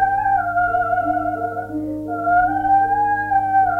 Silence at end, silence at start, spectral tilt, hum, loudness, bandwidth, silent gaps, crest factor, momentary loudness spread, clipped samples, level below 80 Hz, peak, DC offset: 0 s; 0 s; -8 dB/octave; none; -19 LUFS; 3.5 kHz; none; 12 dB; 9 LU; under 0.1%; -44 dBFS; -6 dBFS; under 0.1%